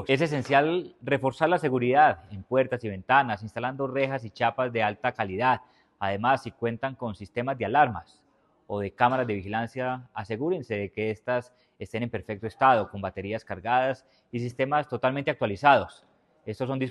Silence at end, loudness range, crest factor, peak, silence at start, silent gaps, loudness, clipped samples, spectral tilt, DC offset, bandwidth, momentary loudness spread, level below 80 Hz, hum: 0 s; 4 LU; 22 dB; -4 dBFS; 0 s; none; -27 LUFS; under 0.1%; -7 dB/octave; under 0.1%; 11.5 kHz; 12 LU; -62 dBFS; none